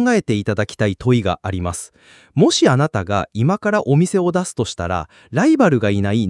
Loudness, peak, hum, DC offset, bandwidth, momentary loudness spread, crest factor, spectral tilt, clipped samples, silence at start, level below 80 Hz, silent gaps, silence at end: -18 LUFS; -2 dBFS; none; under 0.1%; 12 kHz; 10 LU; 16 dB; -6 dB/octave; under 0.1%; 0 s; -50 dBFS; none; 0 s